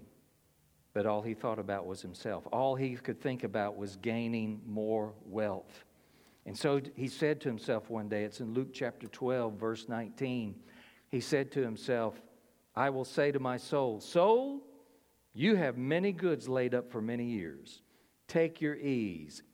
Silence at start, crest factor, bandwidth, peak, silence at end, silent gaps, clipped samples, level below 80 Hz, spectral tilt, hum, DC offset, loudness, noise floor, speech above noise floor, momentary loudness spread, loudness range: 0 s; 20 dB; 16.5 kHz; -16 dBFS; 0.1 s; none; under 0.1%; -76 dBFS; -6.5 dB/octave; none; under 0.1%; -35 LUFS; -69 dBFS; 36 dB; 10 LU; 5 LU